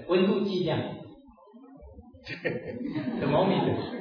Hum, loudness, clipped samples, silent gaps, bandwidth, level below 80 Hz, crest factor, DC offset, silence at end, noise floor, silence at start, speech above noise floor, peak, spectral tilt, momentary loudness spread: none; -28 LUFS; under 0.1%; none; 5.4 kHz; -58 dBFS; 16 dB; under 0.1%; 0 s; -53 dBFS; 0 s; 25 dB; -12 dBFS; -8.5 dB/octave; 20 LU